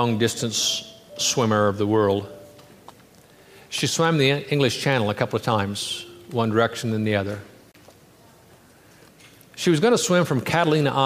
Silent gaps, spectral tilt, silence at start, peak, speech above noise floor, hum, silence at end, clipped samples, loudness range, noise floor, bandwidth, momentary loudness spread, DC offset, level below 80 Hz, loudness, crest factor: none; -4.5 dB/octave; 0 s; -4 dBFS; 30 dB; none; 0 s; under 0.1%; 5 LU; -52 dBFS; 15.5 kHz; 10 LU; under 0.1%; -62 dBFS; -22 LUFS; 18 dB